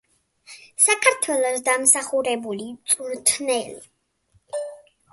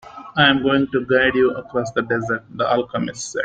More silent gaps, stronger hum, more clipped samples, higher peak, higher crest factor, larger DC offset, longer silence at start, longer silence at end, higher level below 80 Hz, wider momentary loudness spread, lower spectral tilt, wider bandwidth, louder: neither; neither; neither; about the same, -2 dBFS vs -2 dBFS; about the same, 22 dB vs 18 dB; neither; first, 0.5 s vs 0.05 s; first, 0.35 s vs 0 s; second, -70 dBFS vs -52 dBFS; first, 17 LU vs 10 LU; second, -0.5 dB/octave vs -4.5 dB/octave; first, 12 kHz vs 9.2 kHz; about the same, -20 LUFS vs -19 LUFS